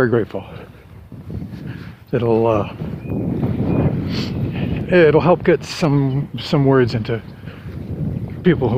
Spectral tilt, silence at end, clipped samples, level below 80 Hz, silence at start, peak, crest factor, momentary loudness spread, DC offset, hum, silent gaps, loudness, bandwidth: -7.5 dB/octave; 0 s; under 0.1%; -40 dBFS; 0 s; 0 dBFS; 18 dB; 18 LU; under 0.1%; none; none; -18 LUFS; 15 kHz